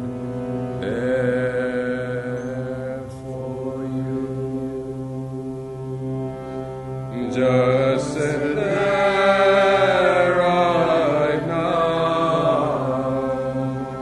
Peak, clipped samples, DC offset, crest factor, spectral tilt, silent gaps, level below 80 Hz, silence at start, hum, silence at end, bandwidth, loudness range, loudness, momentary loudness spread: -4 dBFS; under 0.1%; under 0.1%; 16 dB; -6.5 dB/octave; none; -48 dBFS; 0 s; none; 0 s; 11.5 kHz; 11 LU; -21 LUFS; 14 LU